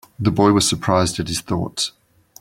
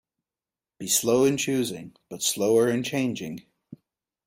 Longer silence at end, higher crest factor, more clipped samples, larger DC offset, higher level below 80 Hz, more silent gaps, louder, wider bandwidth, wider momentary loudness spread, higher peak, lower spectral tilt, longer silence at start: about the same, 0.5 s vs 0.5 s; about the same, 18 dB vs 16 dB; neither; neither; first, -46 dBFS vs -68 dBFS; neither; first, -19 LUFS vs -24 LUFS; about the same, 16.5 kHz vs 16.5 kHz; second, 9 LU vs 17 LU; first, -2 dBFS vs -10 dBFS; about the same, -4.5 dB/octave vs -3.5 dB/octave; second, 0.2 s vs 0.8 s